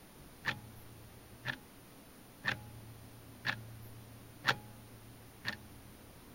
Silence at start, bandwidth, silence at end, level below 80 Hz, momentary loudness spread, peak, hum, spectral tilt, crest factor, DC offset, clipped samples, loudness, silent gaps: 0 s; 16 kHz; 0 s; -64 dBFS; 19 LU; -12 dBFS; none; -3.5 dB/octave; 34 dB; under 0.1%; under 0.1%; -41 LUFS; none